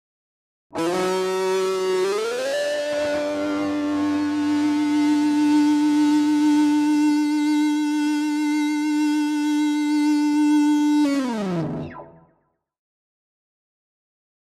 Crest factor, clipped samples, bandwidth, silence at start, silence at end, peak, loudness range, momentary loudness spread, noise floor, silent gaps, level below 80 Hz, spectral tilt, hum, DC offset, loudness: 12 dB; under 0.1%; 13 kHz; 0.75 s; 2.4 s; -10 dBFS; 5 LU; 6 LU; -68 dBFS; none; -64 dBFS; -5 dB/octave; none; under 0.1%; -21 LUFS